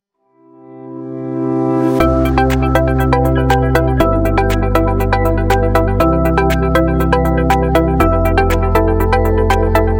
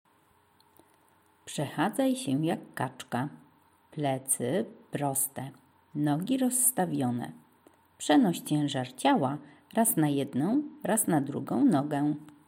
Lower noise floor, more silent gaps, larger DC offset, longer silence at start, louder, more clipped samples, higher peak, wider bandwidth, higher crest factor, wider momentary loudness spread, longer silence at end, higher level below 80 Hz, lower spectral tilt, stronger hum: second, -51 dBFS vs -65 dBFS; neither; neither; second, 0.7 s vs 1.45 s; first, -14 LUFS vs -29 LUFS; neither; first, 0 dBFS vs -12 dBFS; about the same, 17 kHz vs 17 kHz; second, 12 dB vs 18 dB; second, 2 LU vs 12 LU; second, 0 s vs 0.2 s; first, -20 dBFS vs -78 dBFS; first, -7.5 dB/octave vs -4.5 dB/octave; neither